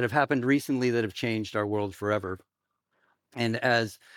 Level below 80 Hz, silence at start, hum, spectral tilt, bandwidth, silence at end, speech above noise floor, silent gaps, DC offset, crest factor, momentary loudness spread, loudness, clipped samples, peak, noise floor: -74 dBFS; 0 s; none; -6 dB/octave; 18 kHz; 0.2 s; 51 dB; none; under 0.1%; 20 dB; 7 LU; -28 LUFS; under 0.1%; -10 dBFS; -78 dBFS